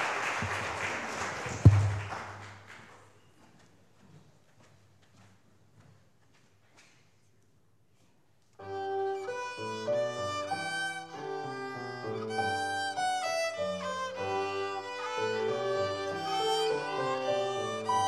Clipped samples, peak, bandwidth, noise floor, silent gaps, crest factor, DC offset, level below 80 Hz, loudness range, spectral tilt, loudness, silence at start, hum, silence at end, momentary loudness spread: under 0.1%; -6 dBFS; 13.5 kHz; -69 dBFS; none; 28 dB; under 0.1%; -52 dBFS; 10 LU; -5 dB/octave; -32 LUFS; 0 s; none; 0 s; 10 LU